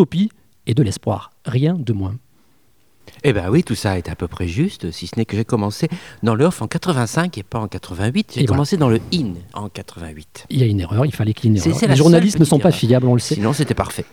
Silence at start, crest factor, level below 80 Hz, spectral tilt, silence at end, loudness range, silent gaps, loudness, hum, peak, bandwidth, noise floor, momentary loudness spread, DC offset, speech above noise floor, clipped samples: 0 s; 16 dB; -44 dBFS; -6.5 dB/octave; 0.1 s; 6 LU; none; -18 LUFS; none; 0 dBFS; 17 kHz; -59 dBFS; 14 LU; 0.3%; 42 dB; under 0.1%